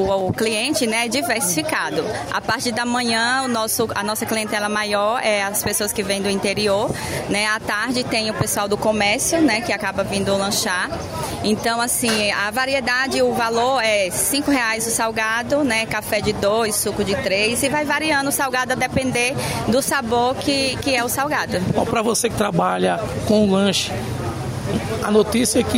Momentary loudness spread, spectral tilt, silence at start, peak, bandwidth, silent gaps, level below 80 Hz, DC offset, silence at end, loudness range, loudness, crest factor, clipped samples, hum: 5 LU; -3.5 dB/octave; 0 s; -4 dBFS; 16 kHz; none; -44 dBFS; under 0.1%; 0 s; 2 LU; -19 LUFS; 16 dB; under 0.1%; none